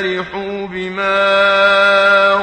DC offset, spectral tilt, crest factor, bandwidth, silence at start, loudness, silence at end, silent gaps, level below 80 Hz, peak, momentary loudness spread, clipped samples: under 0.1%; -4 dB/octave; 14 dB; 9.4 kHz; 0 s; -12 LUFS; 0 s; none; -50 dBFS; 0 dBFS; 13 LU; under 0.1%